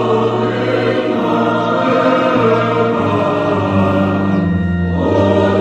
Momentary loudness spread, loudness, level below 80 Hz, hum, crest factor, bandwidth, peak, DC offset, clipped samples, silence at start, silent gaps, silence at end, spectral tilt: 3 LU; -14 LUFS; -44 dBFS; none; 12 dB; 8.4 kHz; 0 dBFS; under 0.1%; under 0.1%; 0 s; none; 0 s; -8 dB/octave